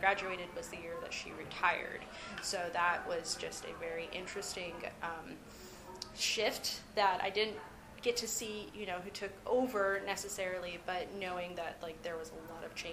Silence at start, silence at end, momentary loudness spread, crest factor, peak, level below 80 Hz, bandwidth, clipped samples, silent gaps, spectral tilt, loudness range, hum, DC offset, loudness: 0 s; 0 s; 12 LU; 24 dB; -14 dBFS; -64 dBFS; 15.5 kHz; under 0.1%; none; -2 dB/octave; 4 LU; none; under 0.1%; -38 LUFS